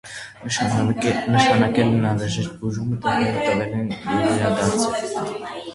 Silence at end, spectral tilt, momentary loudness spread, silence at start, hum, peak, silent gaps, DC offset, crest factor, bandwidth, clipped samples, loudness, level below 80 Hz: 0 s; -5.5 dB/octave; 10 LU; 0.05 s; none; -4 dBFS; none; under 0.1%; 18 dB; 11.5 kHz; under 0.1%; -21 LUFS; -48 dBFS